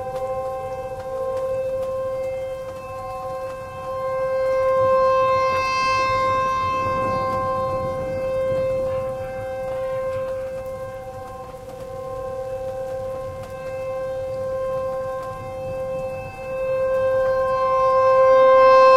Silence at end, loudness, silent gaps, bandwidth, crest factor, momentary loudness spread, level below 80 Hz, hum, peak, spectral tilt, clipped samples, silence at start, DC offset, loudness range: 0 s; -22 LUFS; none; 12.5 kHz; 18 dB; 14 LU; -46 dBFS; none; -4 dBFS; -5 dB/octave; under 0.1%; 0 s; under 0.1%; 10 LU